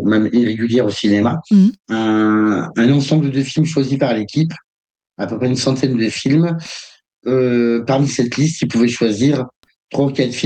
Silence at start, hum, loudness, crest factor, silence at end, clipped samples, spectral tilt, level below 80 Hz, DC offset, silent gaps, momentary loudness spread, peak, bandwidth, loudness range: 0 s; none; -16 LUFS; 12 dB; 0 s; under 0.1%; -6 dB/octave; -56 dBFS; under 0.1%; 4.64-4.94 s, 7.13-7.17 s, 9.56-9.63 s; 8 LU; -2 dBFS; 9 kHz; 4 LU